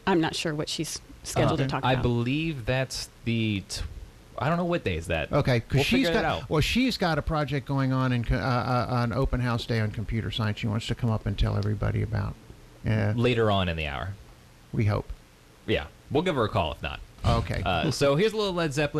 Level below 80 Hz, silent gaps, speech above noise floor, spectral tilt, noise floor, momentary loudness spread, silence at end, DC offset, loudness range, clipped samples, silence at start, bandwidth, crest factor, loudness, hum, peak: -40 dBFS; none; 27 dB; -6 dB/octave; -53 dBFS; 10 LU; 0 s; under 0.1%; 4 LU; under 0.1%; 0.05 s; 14 kHz; 14 dB; -27 LUFS; none; -12 dBFS